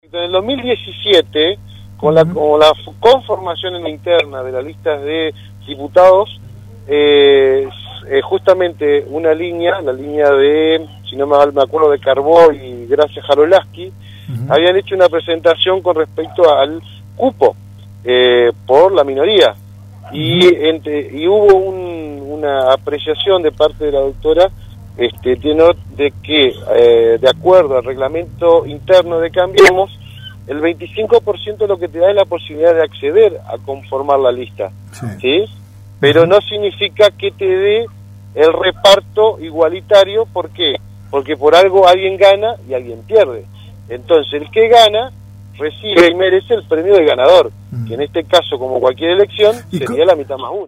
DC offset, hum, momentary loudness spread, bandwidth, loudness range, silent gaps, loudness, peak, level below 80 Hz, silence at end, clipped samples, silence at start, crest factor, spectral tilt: under 0.1%; none; 14 LU; 15 kHz; 3 LU; none; -12 LUFS; 0 dBFS; -44 dBFS; 0 s; 0.2%; 0.15 s; 12 dB; -5 dB/octave